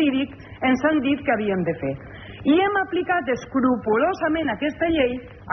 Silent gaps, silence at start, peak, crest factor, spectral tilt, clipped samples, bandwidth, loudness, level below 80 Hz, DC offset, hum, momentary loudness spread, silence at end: none; 0 s; -8 dBFS; 14 dB; -4 dB/octave; under 0.1%; 6.2 kHz; -22 LUFS; -50 dBFS; under 0.1%; none; 9 LU; 0 s